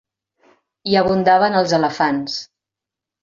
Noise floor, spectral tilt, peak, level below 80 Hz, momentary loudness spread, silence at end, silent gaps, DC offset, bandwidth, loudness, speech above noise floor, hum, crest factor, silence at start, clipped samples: -86 dBFS; -5 dB/octave; -2 dBFS; -54 dBFS; 13 LU; 0.8 s; none; under 0.1%; 7.6 kHz; -17 LUFS; 70 dB; none; 16 dB; 0.85 s; under 0.1%